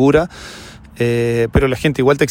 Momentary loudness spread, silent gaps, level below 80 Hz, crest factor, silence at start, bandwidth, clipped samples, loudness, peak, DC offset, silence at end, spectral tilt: 19 LU; none; -32 dBFS; 14 dB; 0 s; 16.5 kHz; under 0.1%; -16 LUFS; 0 dBFS; under 0.1%; 0 s; -6.5 dB/octave